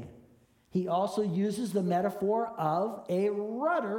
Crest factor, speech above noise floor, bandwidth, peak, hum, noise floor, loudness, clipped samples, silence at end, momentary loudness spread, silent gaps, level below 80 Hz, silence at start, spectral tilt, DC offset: 16 dB; 33 dB; 17 kHz; -16 dBFS; none; -62 dBFS; -31 LUFS; under 0.1%; 0 s; 3 LU; none; -70 dBFS; 0 s; -7 dB/octave; under 0.1%